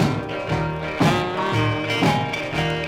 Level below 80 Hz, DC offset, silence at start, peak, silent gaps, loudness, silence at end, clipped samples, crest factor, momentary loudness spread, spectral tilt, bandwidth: -44 dBFS; under 0.1%; 0 s; -4 dBFS; none; -22 LUFS; 0 s; under 0.1%; 18 dB; 5 LU; -6 dB/octave; 16 kHz